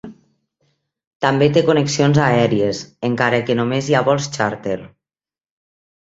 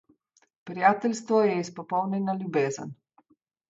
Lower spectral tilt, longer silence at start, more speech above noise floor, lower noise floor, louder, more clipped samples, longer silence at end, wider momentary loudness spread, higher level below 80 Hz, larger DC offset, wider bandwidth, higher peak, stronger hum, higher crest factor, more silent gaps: about the same, -5.5 dB/octave vs -6 dB/octave; second, 0.05 s vs 0.65 s; first, over 74 dB vs 42 dB; first, under -90 dBFS vs -67 dBFS; first, -17 LUFS vs -26 LUFS; neither; first, 1.25 s vs 0.75 s; second, 9 LU vs 12 LU; first, -54 dBFS vs -76 dBFS; neither; about the same, 8 kHz vs 7.8 kHz; first, -2 dBFS vs -6 dBFS; neither; about the same, 18 dB vs 22 dB; first, 1.07-1.20 s vs none